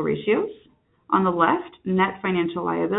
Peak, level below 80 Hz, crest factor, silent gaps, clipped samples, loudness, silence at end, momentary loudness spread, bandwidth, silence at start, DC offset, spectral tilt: -4 dBFS; -60 dBFS; 18 dB; none; under 0.1%; -23 LUFS; 0 s; 6 LU; 4 kHz; 0 s; under 0.1%; -11 dB/octave